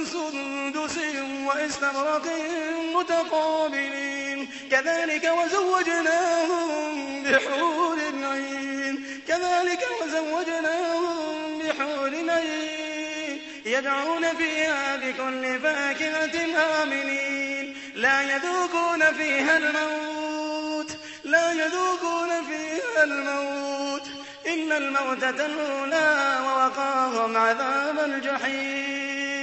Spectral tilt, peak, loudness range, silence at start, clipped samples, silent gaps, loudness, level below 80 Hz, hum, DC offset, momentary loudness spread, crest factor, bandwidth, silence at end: -2 dB/octave; -6 dBFS; 3 LU; 0 s; under 0.1%; none; -25 LUFS; -68 dBFS; none; under 0.1%; 8 LU; 18 dB; 8.4 kHz; 0 s